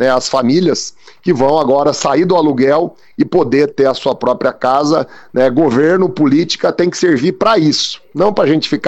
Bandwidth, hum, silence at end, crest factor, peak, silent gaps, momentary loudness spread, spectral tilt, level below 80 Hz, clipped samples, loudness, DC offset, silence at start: 8.4 kHz; none; 0 s; 12 dB; 0 dBFS; none; 5 LU; -5 dB/octave; -52 dBFS; under 0.1%; -13 LUFS; under 0.1%; 0 s